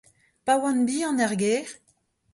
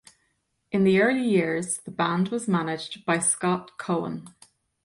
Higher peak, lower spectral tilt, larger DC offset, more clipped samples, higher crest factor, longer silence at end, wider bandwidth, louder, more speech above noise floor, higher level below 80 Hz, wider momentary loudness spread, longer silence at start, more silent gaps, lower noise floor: about the same, -10 dBFS vs -10 dBFS; about the same, -4 dB/octave vs -4.5 dB/octave; neither; neither; about the same, 16 dB vs 16 dB; about the same, 0.6 s vs 0.55 s; about the same, 11.5 kHz vs 11.5 kHz; about the same, -25 LUFS vs -25 LUFS; second, 44 dB vs 48 dB; about the same, -68 dBFS vs -66 dBFS; about the same, 8 LU vs 10 LU; second, 0.45 s vs 0.7 s; neither; second, -67 dBFS vs -73 dBFS